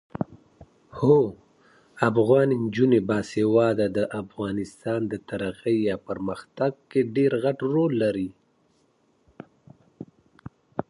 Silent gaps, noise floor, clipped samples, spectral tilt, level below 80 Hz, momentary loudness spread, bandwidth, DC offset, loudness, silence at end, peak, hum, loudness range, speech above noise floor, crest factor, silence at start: none; -65 dBFS; under 0.1%; -8 dB/octave; -58 dBFS; 14 LU; 11.5 kHz; under 0.1%; -24 LUFS; 0.05 s; -6 dBFS; none; 6 LU; 42 dB; 20 dB; 0.2 s